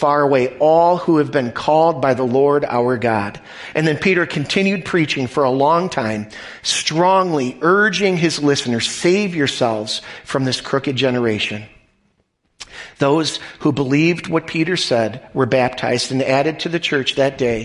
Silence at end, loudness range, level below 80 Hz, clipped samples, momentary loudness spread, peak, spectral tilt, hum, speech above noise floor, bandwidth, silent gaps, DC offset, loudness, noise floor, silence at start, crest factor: 0 s; 4 LU; -52 dBFS; under 0.1%; 8 LU; -2 dBFS; -5 dB/octave; none; 48 dB; 11.5 kHz; none; under 0.1%; -17 LUFS; -65 dBFS; 0 s; 14 dB